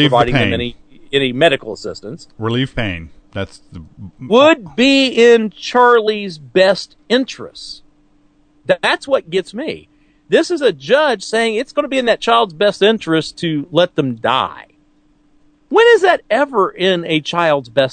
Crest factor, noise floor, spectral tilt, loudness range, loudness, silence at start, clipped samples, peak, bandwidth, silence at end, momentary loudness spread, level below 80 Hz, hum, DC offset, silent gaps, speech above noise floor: 16 dB; -54 dBFS; -5 dB/octave; 7 LU; -14 LUFS; 0 s; under 0.1%; 0 dBFS; 9.4 kHz; 0 s; 16 LU; -44 dBFS; none; under 0.1%; none; 39 dB